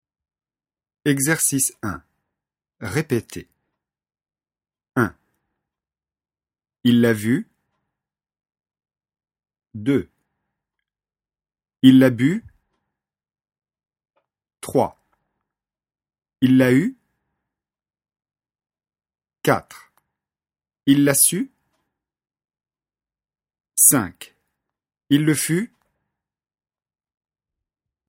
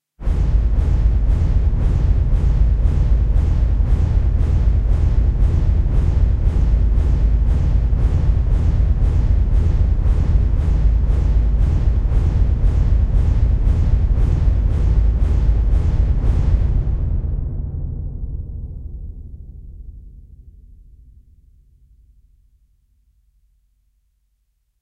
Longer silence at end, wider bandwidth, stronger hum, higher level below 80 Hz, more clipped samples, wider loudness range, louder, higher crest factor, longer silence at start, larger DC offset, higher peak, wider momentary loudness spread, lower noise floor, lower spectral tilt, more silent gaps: second, 2.45 s vs 4.65 s; first, 16.5 kHz vs 3.7 kHz; neither; second, -60 dBFS vs -18 dBFS; neither; about the same, 11 LU vs 9 LU; about the same, -19 LUFS vs -19 LUFS; first, 24 dB vs 12 dB; first, 1.05 s vs 0.2 s; neither; first, 0 dBFS vs -4 dBFS; first, 17 LU vs 10 LU; first, under -90 dBFS vs -66 dBFS; second, -4.5 dB/octave vs -9.5 dB/octave; neither